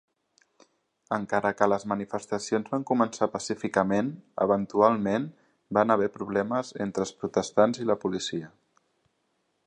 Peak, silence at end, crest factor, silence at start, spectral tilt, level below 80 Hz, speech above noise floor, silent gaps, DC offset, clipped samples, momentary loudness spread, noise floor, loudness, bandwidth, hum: -6 dBFS; 1.2 s; 22 dB; 1.1 s; -5.5 dB/octave; -66 dBFS; 48 dB; none; under 0.1%; under 0.1%; 9 LU; -74 dBFS; -27 LUFS; 10.5 kHz; none